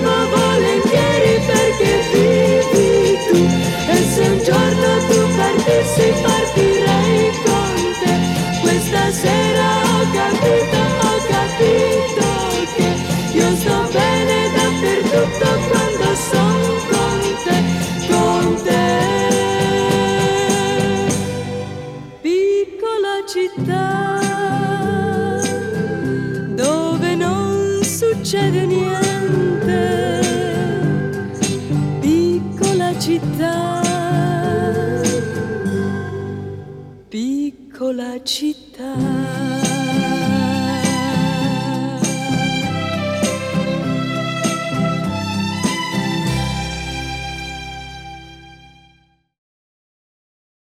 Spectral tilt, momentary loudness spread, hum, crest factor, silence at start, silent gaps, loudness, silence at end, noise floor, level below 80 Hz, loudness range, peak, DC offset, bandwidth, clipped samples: -5 dB/octave; 9 LU; none; 16 dB; 0 s; none; -17 LUFS; 2.15 s; -56 dBFS; -40 dBFS; 8 LU; 0 dBFS; under 0.1%; 16 kHz; under 0.1%